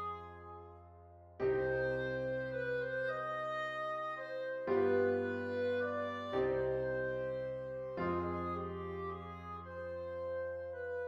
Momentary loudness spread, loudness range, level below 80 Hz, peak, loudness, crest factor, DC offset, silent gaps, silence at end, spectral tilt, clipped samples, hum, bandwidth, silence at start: 12 LU; 5 LU; -64 dBFS; -22 dBFS; -38 LUFS; 16 dB; under 0.1%; none; 0 s; -7.5 dB/octave; under 0.1%; none; 7.2 kHz; 0 s